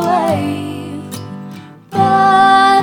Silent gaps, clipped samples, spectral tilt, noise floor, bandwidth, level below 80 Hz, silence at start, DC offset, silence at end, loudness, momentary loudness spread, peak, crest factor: none; under 0.1%; -5 dB/octave; -33 dBFS; 18.5 kHz; -58 dBFS; 0 s; under 0.1%; 0 s; -12 LUFS; 20 LU; 0 dBFS; 12 dB